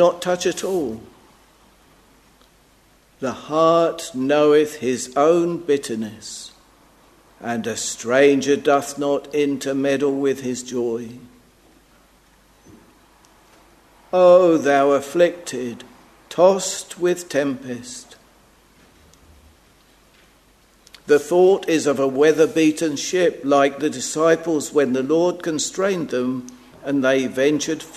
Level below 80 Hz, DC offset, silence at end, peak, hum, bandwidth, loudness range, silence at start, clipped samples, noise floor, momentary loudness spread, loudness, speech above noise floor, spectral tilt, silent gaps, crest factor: -60 dBFS; under 0.1%; 0 s; -2 dBFS; none; 13.5 kHz; 10 LU; 0 s; under 0.1%; -55 dBFS; 14 LU; -19 LUFS; 36 dB; -4.5 dB/octave; none; 20 dB